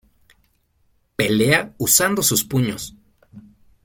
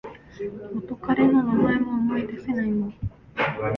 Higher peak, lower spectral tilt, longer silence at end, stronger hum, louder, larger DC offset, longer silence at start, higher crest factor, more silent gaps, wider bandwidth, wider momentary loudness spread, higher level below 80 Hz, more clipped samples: first, -2 dBFS vs -8 dBFS; second, -3 dB/octave vs -9 dB/octave; first, 0.45 s vs 0 s; neither; first, -18 LUFS vs -24 LUFS; neither; first, 1.2 s vs 0.05 s; about the same, 20 dB vs 16 dB; neither; first, 17 kHz vs 5.8 kHz; about the same, 17 LU vs 16 LU; about the same, -52 dBFS vs -48 dBFS; neither